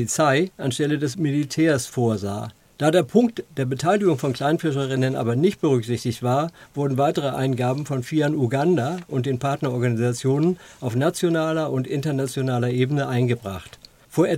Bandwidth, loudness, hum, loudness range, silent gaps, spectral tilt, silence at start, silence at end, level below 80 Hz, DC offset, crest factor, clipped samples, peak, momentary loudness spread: 16 kHz; -22 LUFS; none; 1 LU; none; -6 dB/octave; 0 s; 0 s; -60 dBFS; under 0.1%; 18 dB; under 0.1%; -4 dBFS; 7 LU